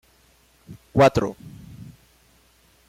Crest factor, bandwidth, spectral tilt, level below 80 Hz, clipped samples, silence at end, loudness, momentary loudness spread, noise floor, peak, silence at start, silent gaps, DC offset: 20 dB; 16 kHz; -6.5 dB/octave; -50 dBFS; under 0.1%; 1.05 s; -20 LUFS; 26 LU; -58 dBFS; -6 dBFS; 0.7 s; none; under 0.1%